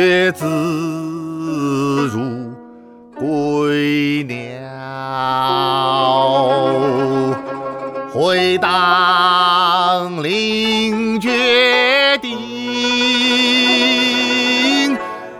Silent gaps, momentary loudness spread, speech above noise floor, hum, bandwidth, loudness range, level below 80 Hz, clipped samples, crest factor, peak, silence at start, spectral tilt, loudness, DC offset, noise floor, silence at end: none; 13 LU; 24 dB; none; 15.5 kHz; 7 LU; -58 dBFS; under 0.1%; 14 dB; -2 dBFS; 0 s; -4 dB/octave; -15 LUFS; under 0.1%; -40 dBFS; 0 s